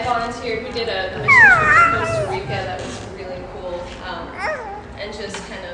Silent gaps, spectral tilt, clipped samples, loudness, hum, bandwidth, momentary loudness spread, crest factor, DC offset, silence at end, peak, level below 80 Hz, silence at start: none; -4 dB/octave; under 0.1%; -15 LUFS; none; 11 kHz; 22 LU; 18 dB; under 0.1%; 0 s; 0 dBFS; -40 dBFS; 0 s